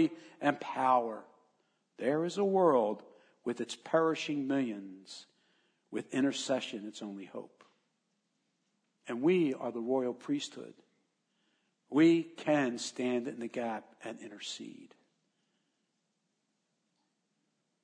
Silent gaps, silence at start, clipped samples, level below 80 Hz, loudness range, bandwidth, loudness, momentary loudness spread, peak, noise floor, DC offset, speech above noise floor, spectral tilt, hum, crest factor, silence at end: none; 0 s; under 0.1%; under -90 dBFS; 9 LU; 10 kHz; -33 LUFS; 18 LU; -14 dBFS; -81 dBFS; under 0.1%; 49 dB; -5 dB/octave; none; 20 dB; 2.95 s